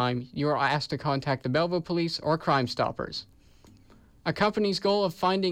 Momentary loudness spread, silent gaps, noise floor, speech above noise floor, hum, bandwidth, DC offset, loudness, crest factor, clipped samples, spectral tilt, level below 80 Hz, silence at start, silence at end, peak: 7 LU; none; -56 dBFS; 29 dB; none; 16 kHz; under 0.1%; -27 LUFS; 14 dB; under 0.1%; -6 dB/octave; -58 dBFS; 0 s; 0 s; -14 dBFS